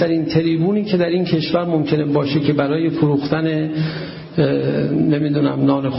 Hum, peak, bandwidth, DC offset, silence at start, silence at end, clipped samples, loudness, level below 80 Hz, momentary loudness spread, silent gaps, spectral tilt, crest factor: none; -2 dBFS; 5.8 kHz; under 0.1%; 0 s; 0 s; under 0.1%; -18 LUFS; -52 dBFS; 3 LU; none; -11 dB/octave; 14 dB